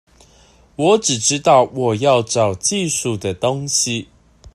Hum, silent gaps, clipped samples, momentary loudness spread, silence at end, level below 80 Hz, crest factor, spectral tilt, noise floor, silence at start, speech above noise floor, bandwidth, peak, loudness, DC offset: none; none; under 0.1%; 7 LU; 0.05 s; -52 dBFS; 16 dB; -3.5 dB/octave; -50 dBFS; 0.8 s; 33 dB; 13.5 kHz; -2 dBFS; -17 LUFS; under 0.1%